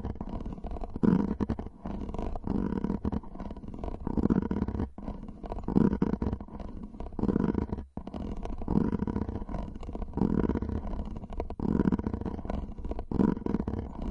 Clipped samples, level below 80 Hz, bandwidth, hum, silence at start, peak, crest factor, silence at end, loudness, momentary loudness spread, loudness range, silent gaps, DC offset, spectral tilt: under 0.1%; -40 dBFS; 6.6 kHz; none; 0 s; -8 dBFS; 24 dB; 0 s; -32 LUFS; 13 LU; 2 LU; none; under 0.1%; -10 dB/octave